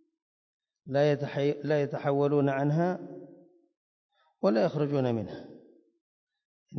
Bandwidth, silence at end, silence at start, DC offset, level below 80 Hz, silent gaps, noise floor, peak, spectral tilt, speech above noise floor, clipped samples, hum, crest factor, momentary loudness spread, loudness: 6.4 kHz; 0 s; 0.85 s; under 0.1%; -72 dBFS; 3.77-4.09 s, 6.01-6.27 s, 6.45-6.66 s; -57 dBFS; -14 dBFS; -8.5 dB/octave; 29 dB; under 0.1%; none; 16 dB; 13 LU; -28 LUFS